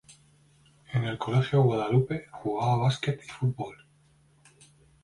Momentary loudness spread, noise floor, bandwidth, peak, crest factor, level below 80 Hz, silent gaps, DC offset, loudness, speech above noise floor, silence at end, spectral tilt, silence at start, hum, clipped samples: 10 LU; -62 dBFS; 11 kHz; -12 dBFS; 18 dB; -60 dBFS; none; under 0.1%; -28 LUFS; 36 dB; 1.3 s; -7.5 dB/octave; 0.9 s; none; under 0.1%